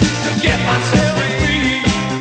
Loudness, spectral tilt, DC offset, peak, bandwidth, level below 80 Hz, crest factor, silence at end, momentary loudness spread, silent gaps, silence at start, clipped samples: -15 LUFS; -4.5 dB/octave; under 0.1%; 0 dBFS; 9.4 kHz; -30 dBFS; 14 dB; 0 s; 2 LU; none; 0 s; under 0.1%